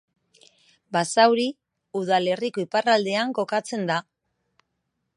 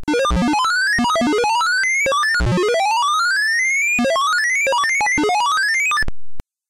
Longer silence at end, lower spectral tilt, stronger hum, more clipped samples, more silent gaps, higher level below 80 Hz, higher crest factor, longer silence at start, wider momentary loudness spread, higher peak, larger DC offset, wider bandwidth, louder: first, 1.15 s vs 0.3 s; about the same, -4 dB/octave vs -3 dB/octave; neither; neither; neither; second, -78 dBFS vs -34 dBFS; first, 20 dB vs 4 dB; first, 0.9 s vs 0 s; first, 10 LU vs 2 LU; first, -4 dBFS vs -12 dBFS; neither; second, 11.5 kHz vs 16.5 kHz; second, -23 LUFS vs -16 LUFS